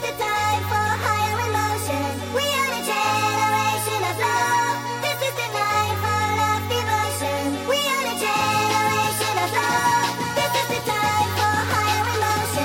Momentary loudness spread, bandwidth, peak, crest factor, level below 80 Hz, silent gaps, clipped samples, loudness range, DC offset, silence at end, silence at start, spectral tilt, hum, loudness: 4 LU; 17 kHz; -8 dBFS; 14 dB; -56 dBFS; none; under 0.1%; 1 LU; under 0.1%; 0 s; 0 s; -3 dB/octave; none; -21 LUFS